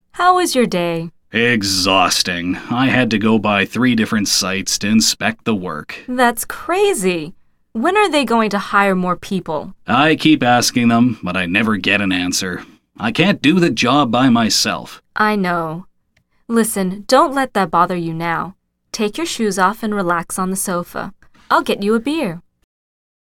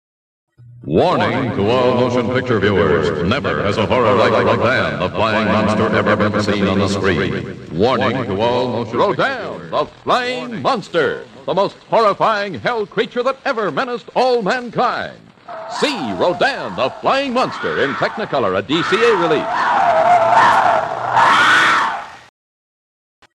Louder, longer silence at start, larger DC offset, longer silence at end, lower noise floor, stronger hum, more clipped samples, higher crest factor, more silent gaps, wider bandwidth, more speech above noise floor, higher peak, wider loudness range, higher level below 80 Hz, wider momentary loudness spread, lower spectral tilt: about the same, -16 LUFS vs -16 LUFS; second, 0.15 s vs 0.65 s; neither; second, 0.9 s vs 1.15 s; second, -61 dBFS vs under -90 dBFS; neither; neither; about the same, 16 dB vs 14 dB; neither; first, 17.5 kHz vs 12 kHz; second, 45 dB vs over 74 dB; about the same, 0 dBFS vs -2 dBFS; about the same, 4 LU vs 6 LU; about the same, -50 dBFS vs -48 dBFS; about the same, 11 LU vs 9 LU; second, -4 dB/octave vs -5.5 dB/octave